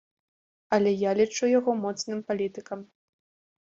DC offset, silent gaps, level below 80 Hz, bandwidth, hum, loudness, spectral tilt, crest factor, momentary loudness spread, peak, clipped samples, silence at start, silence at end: under 0.1%; none; -70 dBFS; 7.8 kHz; none; -26 LUFS; -5 dB/octave; 18 dB; 13 LU; -10 dBFS; under 0.1%; 0.7 s; 0.8 s